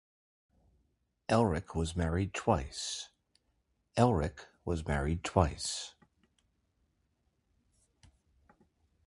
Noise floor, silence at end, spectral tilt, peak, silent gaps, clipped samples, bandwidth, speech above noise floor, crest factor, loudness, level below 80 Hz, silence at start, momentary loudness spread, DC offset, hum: -78 dBFS; 3.15 s; -5.5 dB/octave; -10 dBFS; none; under 0.1%; 11.5 kHz; 46 dB; 26 dB; -33 LUFS; -46 dBFS; 1.3 s; 12 LU; under 0.1%; none